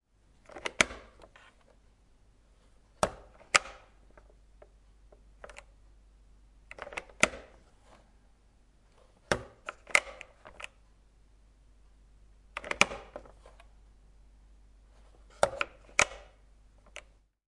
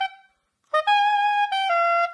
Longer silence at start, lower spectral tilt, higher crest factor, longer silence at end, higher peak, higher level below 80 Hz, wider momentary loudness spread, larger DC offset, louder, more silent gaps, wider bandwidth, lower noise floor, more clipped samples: first, 0.55 s vs 0 s; first, -1.5 dB/octave vs 2.5 dB/octave; first, 36 dB vs 10 dB; first, 0.5 s vs 0 s; first, -2 dBFS vs -12 dBFS; first, -58 dBFS vs -82 dBFS; first, 24 LU vs 6 LU; neither; second, -31 LUFS vs -21 LUFS; neither; about the same, 11.5 kHz vs 10.5 kHz; about the same, -63 dBFS vs -64 dBFS; neither